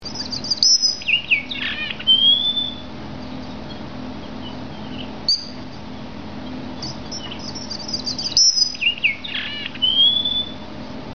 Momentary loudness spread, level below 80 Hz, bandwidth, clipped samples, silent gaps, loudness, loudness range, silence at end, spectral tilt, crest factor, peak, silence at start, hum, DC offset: 20 LU; -48 dBFS; 7.6 kHz; under 0.1%; none; -17 LUFS; 10 LU; 0 s; -0.5 dB/octave; 22 dB; -2 dBFS; 0 s; none; 1%